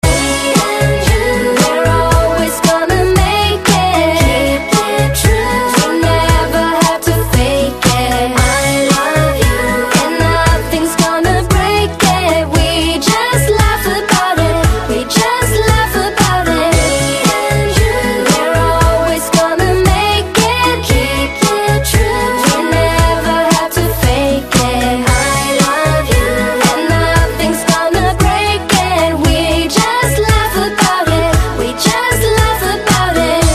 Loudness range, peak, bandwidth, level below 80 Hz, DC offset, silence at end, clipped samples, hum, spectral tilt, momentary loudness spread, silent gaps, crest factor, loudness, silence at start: 1 LU; 0 dBFS; 14.5 kHz; -20 dBFS; under 0.1%; 0 s; under 0.1%; none; -4.5 dB/octave; 2 LU; none; 12 dB; -12 LUFS; 0.05 s